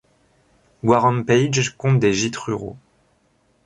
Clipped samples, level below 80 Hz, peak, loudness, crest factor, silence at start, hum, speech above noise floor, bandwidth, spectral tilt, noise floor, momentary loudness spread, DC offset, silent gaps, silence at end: under 0.1%; -54 dBFS; -2 dBFS; -19 LUFS; 18 dB; 0.85 s; none; 44 dB; 10 kHz; -5.5 dB/octave; -62 dBFS; 10 LU; under 0.1%; none; 0.9 s